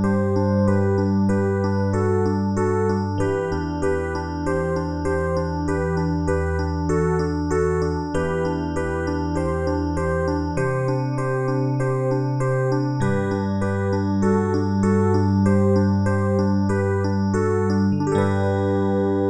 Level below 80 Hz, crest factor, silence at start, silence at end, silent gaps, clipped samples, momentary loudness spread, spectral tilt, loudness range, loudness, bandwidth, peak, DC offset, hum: -42 dBFS; 14 dB; 0 s; 0 s; none; under 0.1%; 5 LU; -8 dB/octave; 3 LU; -22 LUFS; 10.5 kHz; -6 dBFS; under 0.1%; none